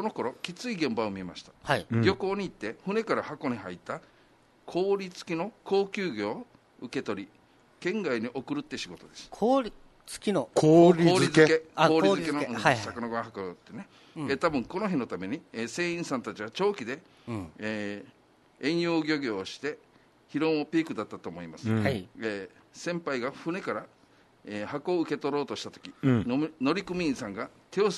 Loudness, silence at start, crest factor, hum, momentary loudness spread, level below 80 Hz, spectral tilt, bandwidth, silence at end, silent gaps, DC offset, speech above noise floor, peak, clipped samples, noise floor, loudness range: -29 LUFS; 0 s; 24 dB; none; 15 LU; -64 dBFS; -6 dB/octave; 12 kHz; 0 s; none; under 0.1%; 33 dB; -6 dBFS; under 0.1%; -61 dBFS; 10 LU